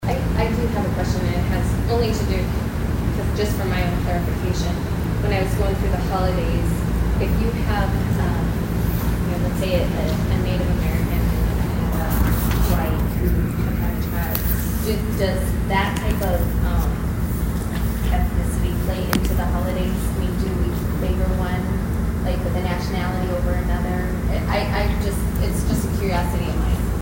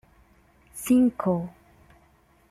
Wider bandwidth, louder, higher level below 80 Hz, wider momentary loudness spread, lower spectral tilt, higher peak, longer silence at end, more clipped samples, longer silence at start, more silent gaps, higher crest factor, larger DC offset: about the same, 16.5 kHz vs 15 kHz; about the same, -22 LUFS vs -24 LUFS; first, -24 dBFS vs -58 dBFS; second, 3 LU vs 19 LU; about the same, -6.5 dB/octave vs -7 dB/octave; first, 0 dBFS vs -10 dBFS; second, 0 s vs 1 s; neither; second, 0 s vs 0.75 s; neither; about the same, 20 dB vs 18 dB; neither